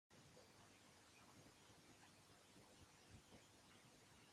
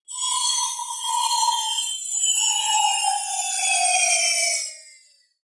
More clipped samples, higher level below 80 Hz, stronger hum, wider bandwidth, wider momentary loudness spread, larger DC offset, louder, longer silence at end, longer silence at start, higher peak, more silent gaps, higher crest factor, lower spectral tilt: neither; about the same, -86 dBFS vs under -90 dBFS; neither; first, 16 kHz vs 11.5 kHz; second, 2 LU vs 7 LU; neither; second, -68 LUFS vs -20 LUFS; second, 0 s vs 0.5 s; about the same, 0.1 s vs 0.1 s; second, -52 dBFS vs -6 dBFS; neither; about the same, 16 dB vs 16 dB; first, -3 dB/octave vs 8 dB/octave